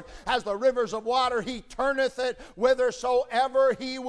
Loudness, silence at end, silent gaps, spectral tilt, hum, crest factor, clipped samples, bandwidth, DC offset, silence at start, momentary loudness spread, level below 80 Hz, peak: -26 LUFS; 0 s; none; -3.5 dB/octave; none; 16 dB; under 0.1%; 11 kHz; under 0.1%; 0 s; 6 LU; -52 dBFS; -10 dBFS